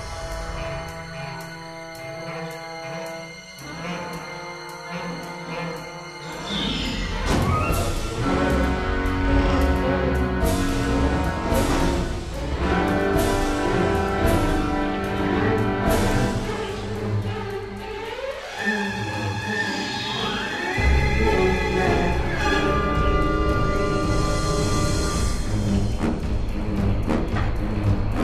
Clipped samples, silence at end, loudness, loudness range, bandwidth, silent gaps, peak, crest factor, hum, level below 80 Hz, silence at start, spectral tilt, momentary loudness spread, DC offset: under 0.1%; 0 s; -24 LUFS; 11 LU; 14 kHz; none; -6 dBFS; 16 dB; none; -28 dBFS; 0 s; -5.5 dB/octave; 12 LU; under 0.1%